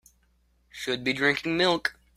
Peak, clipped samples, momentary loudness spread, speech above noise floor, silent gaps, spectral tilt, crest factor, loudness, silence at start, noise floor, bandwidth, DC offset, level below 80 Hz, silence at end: -8 dBFS; under 0.1%; 11 LU; 41 dB; none; -4 dB/octave; 20 dB; -26 LUFS; 0.75 s; -66 dBFS; 15.5 kHz; under 0.1%; -62 dBFS; 0.25 s